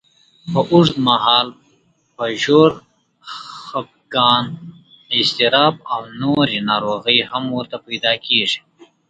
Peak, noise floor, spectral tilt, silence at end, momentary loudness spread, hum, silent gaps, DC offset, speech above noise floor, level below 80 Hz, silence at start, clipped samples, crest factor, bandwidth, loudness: 0 dBFS; -59 dBFS; -5 dB/octave; 0.25 s; 15 LU; none; none; under 0.1%; 42 dB; -58 dBFS; 0.45 s; under 0.1%; 18 dB; 9.2 kHz; -16 LUFS